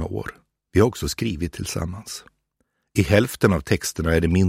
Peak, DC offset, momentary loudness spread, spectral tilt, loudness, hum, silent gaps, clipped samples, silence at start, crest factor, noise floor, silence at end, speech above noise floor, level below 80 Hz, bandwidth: 0 dBFS; under 0.1%; 14 LU; -5.5 dB/octave; -22 LUFS; none; none; under 0.1%; 0 s; 22 dB; -73 dBFS; 0 s; 51 dB; -38 dBFS; 16 kHz